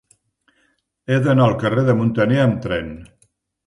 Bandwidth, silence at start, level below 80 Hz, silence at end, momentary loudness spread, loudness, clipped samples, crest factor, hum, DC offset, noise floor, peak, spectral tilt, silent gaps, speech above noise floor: 11 kHz; 1.1 s; -48 dBFS; 0.6 s; 17 LU; -18 LUFS; under 0.1%; 16 dB; none; under 0.1%; -65 dBFS; -2 dBFS; -8 dB/octave; none; 48 dB